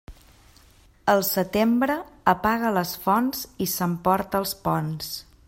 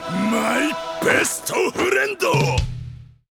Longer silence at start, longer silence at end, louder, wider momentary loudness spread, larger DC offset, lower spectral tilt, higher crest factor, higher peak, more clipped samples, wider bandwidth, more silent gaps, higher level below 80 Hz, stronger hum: about the same, 0.1 s vs 0 s; about the same, 0.25 s vs 0.25 s; second, -24 LUFS vs -20 LUFS; about the same, 7 LU vs 8 LU; neither; about the same, -5 dB/octave vs -4 dB/octave; about the same, 20 dB vs 18 dB; about the same, -4 dBFS vs -4 dBFS; neither; second, 16.5 kHz vs 20 kHz; neither; second, -52 dBFS vs -38 dBFS; neither